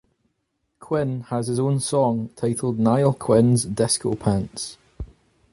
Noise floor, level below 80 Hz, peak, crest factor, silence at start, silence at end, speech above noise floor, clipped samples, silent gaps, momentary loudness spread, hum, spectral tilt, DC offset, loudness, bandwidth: -74 dBFS; -48 dBFS; -4 dBFS; 18 dB; 0.8 s; 0.45 s; 53 dB; under 0.1%; none; 15 LU; none; -6 dB/octave; under 0.1%; -22 LUFS; 11.5 kHz